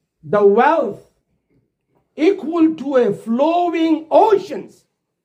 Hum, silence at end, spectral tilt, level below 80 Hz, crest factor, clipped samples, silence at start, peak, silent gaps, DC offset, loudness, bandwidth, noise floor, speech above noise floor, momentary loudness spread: none; 0.6 s; -6.5 dB/octave; -70 dBFS; 16 dB; under 0.1%; 0.25 s; -2 dBFS; none; under 0.1%; -16 LUFS; 9.4 kHz; -65 dBFS; 50 dB; 7 LU